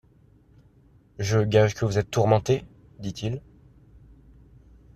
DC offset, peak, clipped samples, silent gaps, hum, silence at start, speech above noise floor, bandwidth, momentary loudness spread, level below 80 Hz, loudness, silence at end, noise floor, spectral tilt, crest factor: under 0.1%; -6 dBFS; under 0.1%; none; none; 1.2 s; 34 dB; 13 kHz; 14 LU; -52 dBFS; -24 LUFS; 1.55 s; -57 dBFS; -6 dB/octave; 20 dB